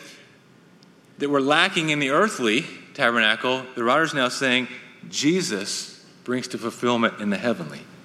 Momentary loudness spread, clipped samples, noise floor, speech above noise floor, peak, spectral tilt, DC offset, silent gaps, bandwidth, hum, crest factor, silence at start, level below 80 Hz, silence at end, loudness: 12 LU; under 0.1%; -53 dBFS; 30 dB; -2 dBFS; -3.5 dB/octave; under 0.1%; none; 14.5 kHz; none; 22 dB; 0 s; -72 dBFS; 0.1 s; -22 LUFS